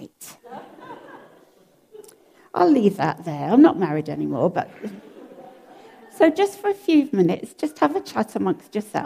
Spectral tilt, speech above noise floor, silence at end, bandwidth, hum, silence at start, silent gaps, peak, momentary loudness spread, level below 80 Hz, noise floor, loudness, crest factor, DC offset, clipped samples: -7 dB/octave; 36 dB; 0 s; 15.5 kHz; none; 0 s; none; -4 dBFS; 24 LU; -68 dBFS; -56 dBFS; -21 LUFS; 18 dB; under 0.1%; under 0.1%